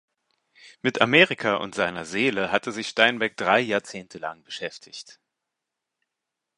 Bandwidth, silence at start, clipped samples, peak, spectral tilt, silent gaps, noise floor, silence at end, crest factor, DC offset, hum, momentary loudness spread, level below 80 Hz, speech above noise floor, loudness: 11.5 kHz; 0.65 s; under 0.1%; 0 dBFS; -4 dB/octave; none; -84 dBFS; 1.45 s; 26 dB; under 0.1%; none; 18 LU; -66 dBFS; 60 dB; -23 LUFS